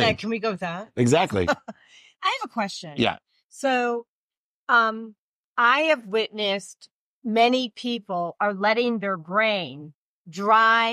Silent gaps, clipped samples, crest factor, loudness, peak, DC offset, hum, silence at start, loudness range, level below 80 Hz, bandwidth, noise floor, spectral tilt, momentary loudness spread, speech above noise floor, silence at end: 3.44-3.49 s, 4.08-4.30 s, 4.37-4.67 s, 5.18-5.56 s, 6.91-7.22 s, 9.95-10.25 s; under 0.1%; 18 dB; -23 LUFS; -6 dBFS; under 0.1%; none; 0 s; 3 LU; -60 dBFS; 13.5 kHz; under -90 dBFS; -4.5 dB/octave; 15 LU; over 67 dB; 0 s